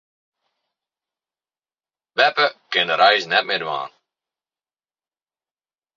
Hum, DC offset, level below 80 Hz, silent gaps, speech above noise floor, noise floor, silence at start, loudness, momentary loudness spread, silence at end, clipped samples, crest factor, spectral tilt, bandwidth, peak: none; under 0.1%; -76 dBFS; none; over 71 dB; under -90 dBFS; 2.15 s; -18 LUFS; 13 LU; 2.1 s; under 0.1%; 22 dB; -2.5 dB/octave; 7.4 kHz; -2 dBFS